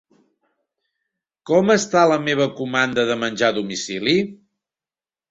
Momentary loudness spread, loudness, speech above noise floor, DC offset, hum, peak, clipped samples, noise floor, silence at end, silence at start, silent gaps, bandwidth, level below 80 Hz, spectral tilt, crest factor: 7 LU; -19 LUFS; over 71 dB; under 0.1%; none; -2 dBFS; under 0.1%; under -90 dBFS; 0.95 s; 1.45 s; none; 8.2 kHz; -62 dBFS; -4 dB/octave; 18 dB